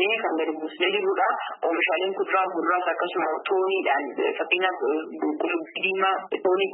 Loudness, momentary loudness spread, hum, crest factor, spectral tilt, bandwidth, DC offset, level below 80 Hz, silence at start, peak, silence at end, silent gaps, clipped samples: -25 LUFS; 4 LU; none; 16 dB; -7.5 dB/octave; 4.1 kHz; under 0.1%; -88 dBFS; 0 s; -10 dBFS; 0 s; none; under 0.1%